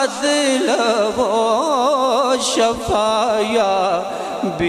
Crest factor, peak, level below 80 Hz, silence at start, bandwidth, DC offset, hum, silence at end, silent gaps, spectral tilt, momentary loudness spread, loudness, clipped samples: 12 dB; -6 dBFS; -46 dBFS; 0 s; 13 kHz; under 0.1%; none; 0 s; none; -3 dB/octave; 3 LU; -17 LUFS; under 0.1%